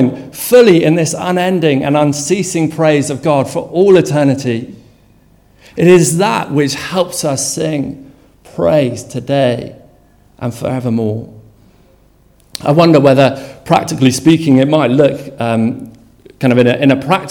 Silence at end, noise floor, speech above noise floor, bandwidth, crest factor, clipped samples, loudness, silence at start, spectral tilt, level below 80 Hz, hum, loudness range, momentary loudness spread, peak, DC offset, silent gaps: 0 s; -48 dBFS; 37 dB; 18.5 kHz; 12 dB; 0.4%; -12 LUFS; 0 s; -5.5 dB/octave; -48 dBFS; none; 7 LU; 14 LU; 0 dBFS; under 0.1%; none